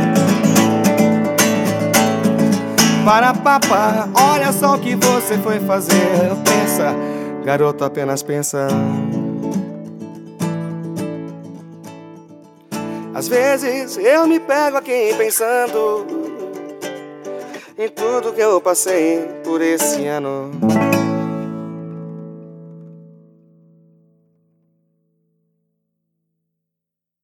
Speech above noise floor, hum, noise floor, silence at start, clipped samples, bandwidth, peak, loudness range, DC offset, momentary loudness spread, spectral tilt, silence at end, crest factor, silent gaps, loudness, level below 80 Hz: 68 dB; none; -83 dBFS; 0 s; under 0.1%; 19 kHz; 0 dBFS; 11 LU; under 0.1%; 17 LU; -4.5 dB/octave; 4.2 s; 18 dB; none; -16 LUFS; -62 dBFS